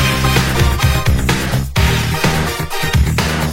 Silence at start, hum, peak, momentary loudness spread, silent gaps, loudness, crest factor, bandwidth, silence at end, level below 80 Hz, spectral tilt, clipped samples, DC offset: 0 s; none; 0 dBFS; 4 LU; none; -15 LUFS; 14 dB; 16.5 kHz; 0 s; -20 dBFS; -4.5 dB/octave; under 0.1%; under 0.1%